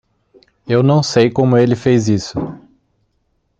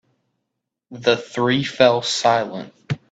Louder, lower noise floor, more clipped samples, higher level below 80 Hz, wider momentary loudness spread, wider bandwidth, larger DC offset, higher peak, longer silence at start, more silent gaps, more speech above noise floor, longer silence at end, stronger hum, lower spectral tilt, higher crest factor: first, -14 LUFS vs -19 LUFS; second, -65 dBFS vs -79 dBFS; neither; first, -50 dBFS vs -62 dBFS; second, 11 LU vs 14 LU; about the same, 8.8 kHz vs 9.2 kHz; neither; about the same, 0 dBFS vs 0 dBFS; second, 0.65 s vs 0.9 s; neither; second, 51 dB vs 61 dB; first, 1.05 s vs 0.15 s; neither; first, -6.5 dB/octave vs -4.5 dB/octave; about the same, 16 dB vs 20 dB